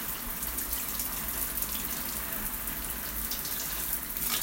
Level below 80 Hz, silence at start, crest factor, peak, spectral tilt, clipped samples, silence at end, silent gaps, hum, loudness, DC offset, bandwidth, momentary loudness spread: -46 dBFS; 0 s; 20 dB; -14 dBFS; -1.5 dB/octave; under 0.1%; 0 s; none; none; -31 LUFS; under 0.1%; 17 kHz; 3 LU